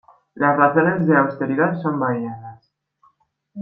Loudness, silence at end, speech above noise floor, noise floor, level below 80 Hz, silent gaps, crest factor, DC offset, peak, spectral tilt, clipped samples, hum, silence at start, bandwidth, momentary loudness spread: -18 LUFS; 0 s; 43 dB; -61 dBFS; -64 dBFS; none; 18 dB; under 0.1%; -2 dBFS; -11.5 dB/octave; under 0.1%; none; 0.35 s; 5.2 kHz; 10 LU